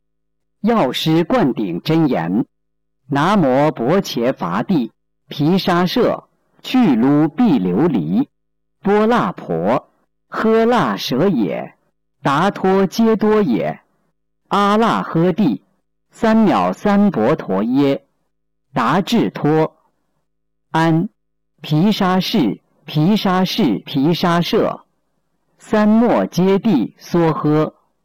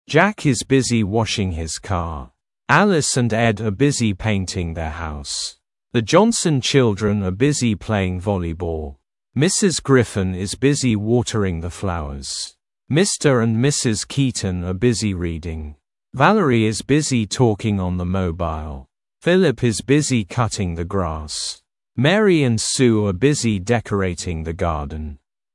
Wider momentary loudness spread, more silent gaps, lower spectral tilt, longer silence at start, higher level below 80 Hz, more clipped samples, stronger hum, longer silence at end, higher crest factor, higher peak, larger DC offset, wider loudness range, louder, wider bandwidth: about the same, 9 LU vs 11 LU; neither; first, -7 dB/octave vs -5 dB/octave; first, 0.65 s vs 0.1 s; second, -50 dBFS vs -42 dBFS; neither; neither; about the same, 0.35 s vs 0.4 s; second, 8 dB vs 18 dB; second, -8 dBFS vs 0 dBFS; neither; about the same, 2 LU vs 2 LU; first, -16 LUFS vs -19 LUFS; first, 17 kHz vs 12 kHz